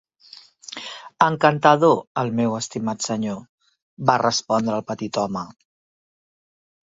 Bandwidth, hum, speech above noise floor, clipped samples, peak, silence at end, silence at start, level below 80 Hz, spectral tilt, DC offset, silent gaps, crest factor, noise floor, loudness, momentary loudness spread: 8 kHz; none; 28 dB; under 0.1%; 0 dBFS; 1.3 s; 0.7 s; -62 dBFS; -4.5 dB/octave; under 0.1%; 2.07-2.15 s, 3.49-3.58 s, 3.82-3.97 s; 22 dB; -48 dBFS; -21 LUFS; 18 LU